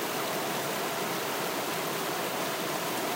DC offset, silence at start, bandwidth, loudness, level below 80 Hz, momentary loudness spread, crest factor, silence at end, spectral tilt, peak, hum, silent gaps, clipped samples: under 0.1%; 0 s; 16 kHz; -31 LUFS; -74 dBFS; 0 LU; 12 dB; 0 s; -2.5 dB/octave; -18 dBFS; none; none; under 0.1%